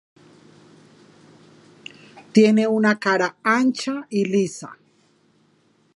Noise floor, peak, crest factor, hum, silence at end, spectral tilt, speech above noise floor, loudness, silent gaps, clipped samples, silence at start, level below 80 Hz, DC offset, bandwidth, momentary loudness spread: -61 dBFS; -2 dBFS; 20 dB; none; 1.25 s; -5.5 dB/octave; 42 dB; -20 LUFS; none; under 0.1%; 2.15 s; -74 dBFS; under 0.1%; 11 kHz; 25 LU